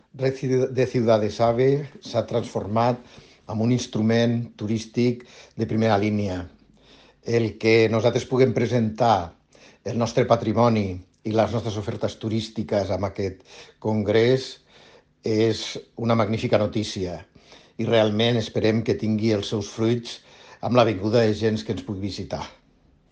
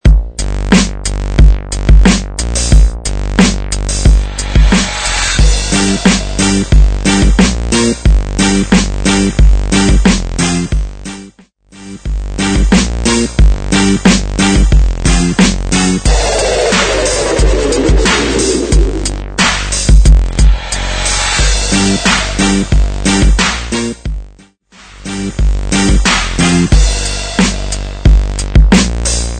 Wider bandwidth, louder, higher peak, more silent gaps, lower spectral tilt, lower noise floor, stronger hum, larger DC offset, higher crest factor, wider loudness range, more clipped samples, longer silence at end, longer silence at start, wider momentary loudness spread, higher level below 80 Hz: about the same, 8.8 kHz vs 9.4 kHz; second, -23 LUFS vs -11 LUFS; second, -4 dBFS vs 0 dBFS; neither; first, -6.5 dB/octave vs -4.5 dB/octave; first, -59 dBFS vs -41 dBFS; neither; neither; first, 18 dB vs 10 dB; about the same, 3 LU vs 4 LU; second, under 0.1% vs 1%; first, 0.6 s vs 0 s; about the same, 0.15 s vs 0.05 s; first, 12 LU vs 8 LU; second, -56 dBFS vs -12 dBFS